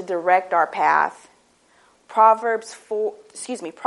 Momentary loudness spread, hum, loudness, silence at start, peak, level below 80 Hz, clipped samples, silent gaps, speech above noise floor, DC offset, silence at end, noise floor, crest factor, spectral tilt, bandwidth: 15 LU; none; -20 LUFS; 0 s; -2 dBFS; -78 dBFS; under 0.1%; none; 38 dB; under 0.1%; 0 s; -58 dBFS; 20 dB; -3 dB/octave; 11.5 kHz